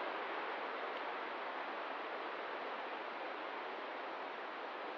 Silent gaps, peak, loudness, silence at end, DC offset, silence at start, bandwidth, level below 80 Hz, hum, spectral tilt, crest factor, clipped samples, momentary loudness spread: none; -30 dBFS; -43 LUFS; 0 s; under 0.1%; 0 s; 7.4 kHz; under -90 dBFS; none; 1 dB/octave; 14 dB; under 0.1%; 3 LU